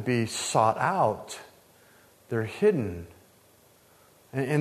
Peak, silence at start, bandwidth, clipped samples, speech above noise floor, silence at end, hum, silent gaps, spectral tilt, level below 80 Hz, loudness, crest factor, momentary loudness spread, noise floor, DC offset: -8 dBFS; 0 s; 13.5 kHz; under 0.1%; 33 dB; 0 s; none; none; -5 dB/octave; -62 dBFS; -27 LUFS; 20 dB; 18 LU; -59 dBFS; under 0.1%